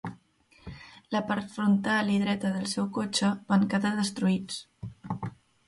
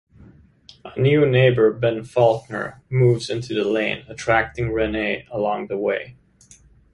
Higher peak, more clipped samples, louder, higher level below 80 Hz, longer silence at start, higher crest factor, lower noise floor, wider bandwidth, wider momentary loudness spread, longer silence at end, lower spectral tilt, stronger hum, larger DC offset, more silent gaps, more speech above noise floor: second, -12 dBFS vs -2 dBFS; neither; second, -28 LUFS vs -20 LUFS; second, -62 dBFS vs -46 dBFS; second, 0.05 s vs 0.85 s; about the same, 18 dB vs 18 dB; first, -61 dBFS vs -51 dBFS; about the same, 11.5 kHz vs 11 kHz; first, 19 LU vs 11 LU; second, 0.35 s vs 0.8 s; second, -5 dB/octave vs -7 dB/octave; neither; neither; neither; about the same, 34 dB vs 32 dB